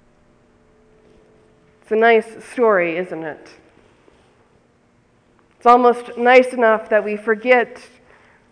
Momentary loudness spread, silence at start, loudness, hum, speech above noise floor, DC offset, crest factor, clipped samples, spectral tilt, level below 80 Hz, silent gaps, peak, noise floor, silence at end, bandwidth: 15 LU; 1.9 s; -16 LUFS; none; 41 dB; under 0.1%; 18 dB; under 0.1%; -5 dB/octave; -64 dBFS; none; 0 dBFS; -57 dBFS; 0.75 s; 10.5 kHz